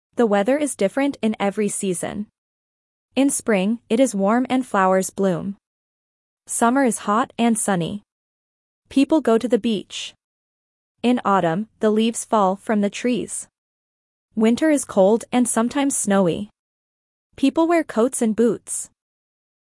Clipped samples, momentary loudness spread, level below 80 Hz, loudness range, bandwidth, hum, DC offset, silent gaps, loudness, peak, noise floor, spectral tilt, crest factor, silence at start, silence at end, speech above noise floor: under 0.1%; 12 LU; -62 dBFS; 3 LU; 12 kHz; none; under 0.1%; 2.38-3.09 s, 5.67-6.37 s, 8.12-8.82 s, 10.24-10.95 s, 13.58-14.29 s, 16.59-17.30 s; -20 LUFS; -4 dBFS; under -90 dBFS; -4.5 dB/octave; 18 dB; 0.15 s; 0.85 s; over 71 dB